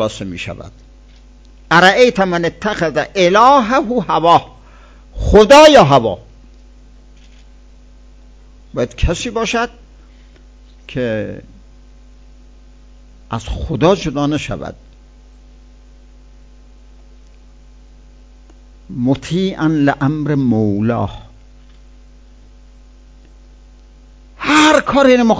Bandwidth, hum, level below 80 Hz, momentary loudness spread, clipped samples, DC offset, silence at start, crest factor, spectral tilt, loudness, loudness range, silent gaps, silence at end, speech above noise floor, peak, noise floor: 8 kHz; none; -34 dBFS; 18 LU; 0.5%; under 0.1%; 0 s; 16 dB; -5 dB/octave; -13 LUFS; 16 LU; none; 0 s; 29 dB; 0 dBFS; -41 dBFS